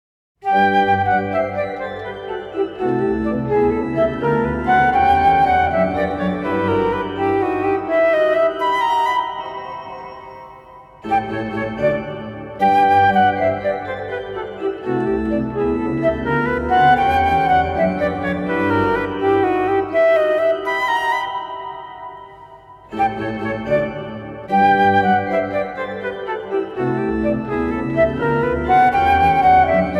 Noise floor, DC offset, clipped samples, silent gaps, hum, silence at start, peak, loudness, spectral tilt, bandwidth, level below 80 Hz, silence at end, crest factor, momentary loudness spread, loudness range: -41 dBFS; under 0.1%; under 0.1%; none; none; 0.45 s; -2 dBFS; -18 LUFS; -7 dB/octave; 12 kHz; -40 dBFS; 0 s; 16 dB; 14 LU; 5 LU